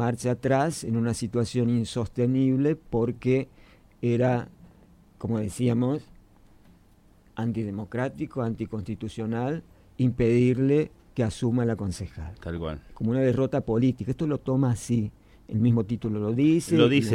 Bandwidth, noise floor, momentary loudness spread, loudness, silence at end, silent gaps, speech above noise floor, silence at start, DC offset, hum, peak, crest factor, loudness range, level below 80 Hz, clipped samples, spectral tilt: 12.5 kHz; -57 dBFS; 11 LU; -26 LUFS; 0 s; none; 32 dB; 0 s; under 0.1%; none; -8 dBFS; 18 dB; 6 LU; -50 dBFS; under 0.1%; -7 dB/octave